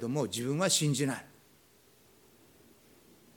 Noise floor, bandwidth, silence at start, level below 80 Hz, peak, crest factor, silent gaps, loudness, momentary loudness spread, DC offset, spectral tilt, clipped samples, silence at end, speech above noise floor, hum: -63 dBFS; 19 kHz; 0 s; -74 dBFS; -14 dBFS; 20 dB; none; -30 LUFS; 8 LU; under 0.1%; -4 dB/octave; under 0.1%; 2.1 s; 32 dB; none